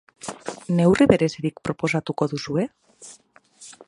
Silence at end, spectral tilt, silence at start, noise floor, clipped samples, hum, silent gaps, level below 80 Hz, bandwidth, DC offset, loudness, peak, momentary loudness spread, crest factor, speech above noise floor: 0.15 s; -6.5 dB/octave; 0.25 s; -54 dBFS; under 0.1%; none; none; -52 dBFS; 11 kHz; under 0.1%; -22 LUFS; 0 dBFS; 20 LU; 22 dB; 33 dB